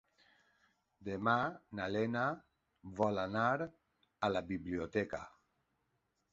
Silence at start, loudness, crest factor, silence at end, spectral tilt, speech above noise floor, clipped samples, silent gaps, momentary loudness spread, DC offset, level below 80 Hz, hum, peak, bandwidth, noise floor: 1 s; -37 LUFS; 22 dB; 1.05 s; -4.5 dB/octave; 45 dB; under 0.1%; none; 14 LU; under 0.1%; -66 dBFS; none; -18 dBFS; 7.6 kHz; -82 dBFS